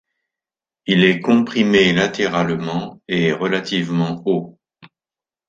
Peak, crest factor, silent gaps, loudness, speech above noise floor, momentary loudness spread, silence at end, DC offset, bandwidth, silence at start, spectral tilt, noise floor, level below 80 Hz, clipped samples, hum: -2 dBFS; 18 dB; none; -18 LUFS; over 73 dB; 10 LU; 0.6 s; under 0.1%; 7.6 kHz; 0.85 s; -6 dB/octave; under -90 dBFS; -56 dBFS; under 0.1%; none